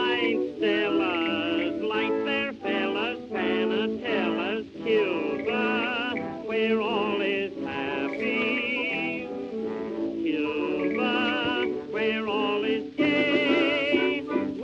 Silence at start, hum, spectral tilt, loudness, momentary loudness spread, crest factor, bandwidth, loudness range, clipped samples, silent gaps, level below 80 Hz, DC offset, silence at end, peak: 0 s; none; -6 dB/octave; -26 LUFS; 7 LU; 16 dB; 7.6 kHz; 3 LU; under 0.1%; none; -64 dBFS; under 0.1%; 0 s; -10 dBFS